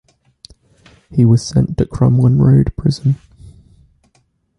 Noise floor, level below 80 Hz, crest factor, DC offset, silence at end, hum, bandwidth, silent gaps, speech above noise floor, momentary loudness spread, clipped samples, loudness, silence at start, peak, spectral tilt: -60 dBFS; -34 dBFS; 14 dB; under 0.1%; 1.45 s; none; 10.5 kHz; none; 48 dB; 8 LU; under 0.1%; -14 LUFS; 1.1 s; -2 dBFS; -8 dB/octave